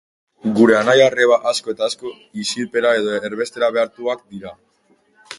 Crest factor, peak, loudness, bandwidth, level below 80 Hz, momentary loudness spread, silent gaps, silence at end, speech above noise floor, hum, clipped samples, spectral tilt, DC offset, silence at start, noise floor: 18 dB; 0 dBFS; -17 LUFS; 11.5 kHz; -62 dBFS; 16 LU; none; 0.05 s; 42 dB; none; under 0.1%; -4 dB/octave; under 0.1%; 0.45 s; -59 dBFS